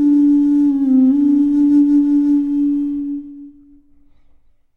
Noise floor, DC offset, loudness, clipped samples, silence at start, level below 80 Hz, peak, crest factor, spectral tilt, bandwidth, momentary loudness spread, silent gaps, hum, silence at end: -50 dBFS; under 0.1%; -14 LUFS; under 0.1%; 0 s; -50 dBFS; -6 dBFS; 10 dB; -8 dB/octave; 1.8 kHz; 11 LU; none; none; 1.25 s